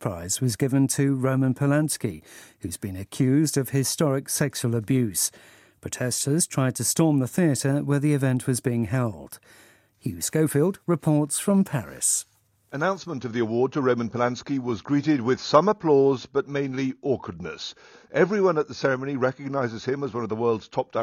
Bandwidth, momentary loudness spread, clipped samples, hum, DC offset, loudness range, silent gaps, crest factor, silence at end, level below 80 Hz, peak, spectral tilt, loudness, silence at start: 16 kHz; 12 LU; under 0.1%; none; under 0.1%; 3 LU; none; 22 dB; 0 s; -60 dBFS; -2 dBFS; -5 dB/octave; -24 LUFS; 0 s